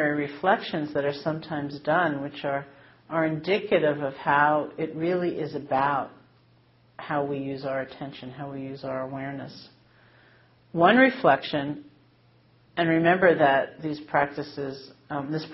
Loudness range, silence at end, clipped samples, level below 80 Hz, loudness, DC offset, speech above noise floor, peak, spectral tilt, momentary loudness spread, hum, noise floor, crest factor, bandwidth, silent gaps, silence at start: 10 LU; 0 s; under 0.1%; -66 dBFS; -25 LUFS; under 0.1%; 34 dB; -4 dBFS; -4 dB/octave; 16 LU; none; -60 dBFS; 22 dB; 5.8 kHz; none; 0 s